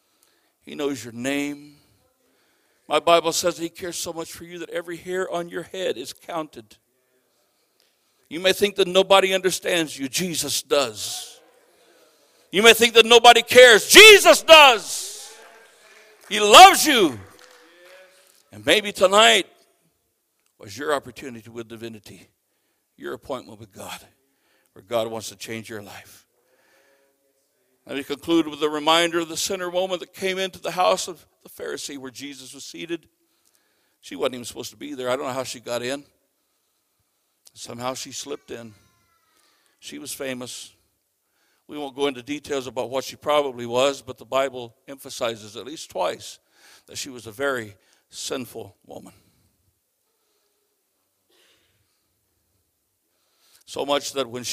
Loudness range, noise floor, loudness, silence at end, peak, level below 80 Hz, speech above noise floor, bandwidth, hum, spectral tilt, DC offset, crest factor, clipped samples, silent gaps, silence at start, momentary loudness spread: 24 LU; -72 dBFS; -17 LUFS; 0 s; 0 dBFS; -60 dBFS; 52 dB; 15.5 kHz; none; -1.5 dB/octave; under 0.1%; 22 dB; under 0.1%; none; 0.65 s; 26 LU